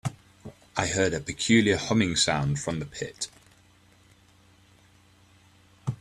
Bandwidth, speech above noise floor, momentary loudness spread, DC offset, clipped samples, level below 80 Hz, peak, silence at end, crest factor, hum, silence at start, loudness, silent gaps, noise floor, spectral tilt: 12.5 kHz; 33 dB; 15 LU; under 0.1%; under 0.1%; -54 dBFS; -6 dBFS; 0.05 s; 24 dB; none; 0.05 s; -26 LUFS; none; -59 dBFS; -4 dB/octave